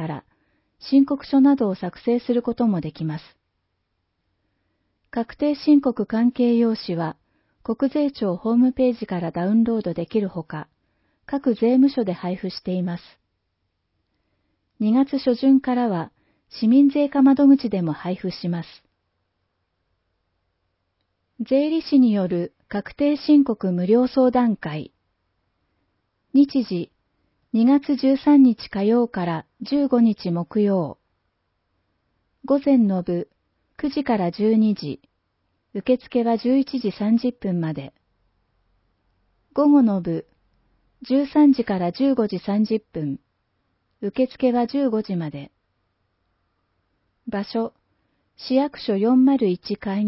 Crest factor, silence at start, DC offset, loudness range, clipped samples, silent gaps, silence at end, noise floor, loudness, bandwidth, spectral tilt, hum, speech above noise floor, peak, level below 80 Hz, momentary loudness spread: 16 dB; 0 s; under 0.1%; 7 LU; under 0.1%; none; 0 s; -74 dBFS; -21 LUFS; 5.8 kHz; -11.5 dB/octave; none; 55 dB; -6 dBFS; -60 dBFS; 14 LU